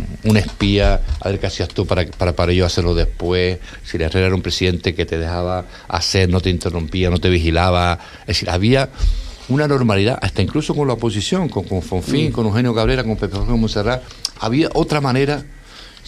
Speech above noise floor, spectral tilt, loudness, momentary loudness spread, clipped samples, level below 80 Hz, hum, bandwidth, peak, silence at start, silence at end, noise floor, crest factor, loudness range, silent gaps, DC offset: 22 dB; -6 dB/octave; -18 LUFS; 7 LU; under 0.1%; -26 dBFS; none; 13.5 kHz; 0 dBFS; 0 s; 0.15 s; -39 dBFS; 16 dB; 2 LU; none; under 0.1%